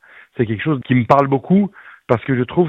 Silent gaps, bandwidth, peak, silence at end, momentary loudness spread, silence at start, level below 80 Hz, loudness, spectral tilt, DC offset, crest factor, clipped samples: none; 6.8 kHz; 0 dBFS; 0 s; 9 LU; 0.4 s; -52 dBFS; -17 LUFS; -9.5 dB/octave; under 0.1%; 16 dB; under 0.1%